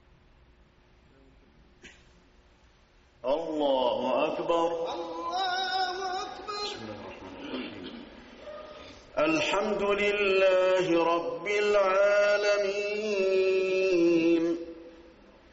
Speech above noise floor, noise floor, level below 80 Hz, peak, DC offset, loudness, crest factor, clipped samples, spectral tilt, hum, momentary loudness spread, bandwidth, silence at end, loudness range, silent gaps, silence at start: 34 dB; -61 dBFS; -60 dBFS; -14 dBFS; under 0.1%; -27 LUFS; 14 dB; under 0.1%; -2 dB/octave; none; 20 LU; 8 kHz; 0.45 s; 10 LU; none; 1.85 s